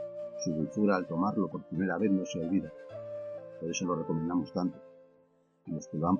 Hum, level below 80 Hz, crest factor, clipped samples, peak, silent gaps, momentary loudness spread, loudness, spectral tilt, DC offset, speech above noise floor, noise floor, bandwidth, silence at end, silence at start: none; -66 dBFS; 18 dB; under 0.1%; -14 dBFS; none; 13 LU; -33 LUFS; -6 dB/octave; under 0.1%; 36 dB; -67 dBFS; 7 kHz; 0 s; 0 s